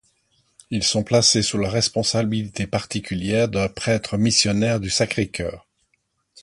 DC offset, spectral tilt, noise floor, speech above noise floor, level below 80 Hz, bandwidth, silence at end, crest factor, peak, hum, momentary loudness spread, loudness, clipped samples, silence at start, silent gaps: under 0.1%; -4 dB/octave; -70 dBFS; 49 dB; -46 dBFS; 11.5 kHz; 0.85 s; 20 dB; -2 dBFS; none; 10 LU; -21 LUFS; under 0.1%; 0.7 s; none